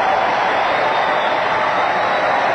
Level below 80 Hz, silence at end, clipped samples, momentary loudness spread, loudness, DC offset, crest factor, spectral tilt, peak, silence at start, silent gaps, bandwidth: -54 dBFS; 0 s; under 0.1%; 1 LU; -16 LUFS; under 0.1%; 12 dB; -4 dB/octave; -4 dBFS; 0 s; none; 9 kHz